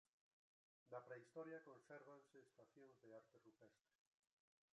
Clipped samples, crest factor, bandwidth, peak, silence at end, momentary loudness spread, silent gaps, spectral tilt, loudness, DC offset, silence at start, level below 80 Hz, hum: under 0.1%; 22 dB; 9.6 kHz; -44 dBFS; 0.95 s; 9 LU; none; -6.5 dB/octave; -61 LUFS; under 0.1%; 0.85 s; under -90 dBFS; none